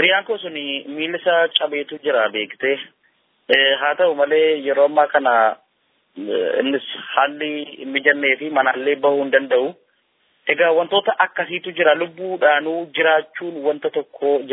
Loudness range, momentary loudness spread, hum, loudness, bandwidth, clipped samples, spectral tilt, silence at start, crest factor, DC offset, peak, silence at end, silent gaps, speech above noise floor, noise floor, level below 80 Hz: 3 LU; 10 LU; none; -18 LUFS; 5.4 kHz; under 0.1%; -6.5 dB/octave; 0 s; 18 dB; under 0.1%; 0 dBFS; 0 s; none; 47 dB; -65 dBFS; -80 dBFS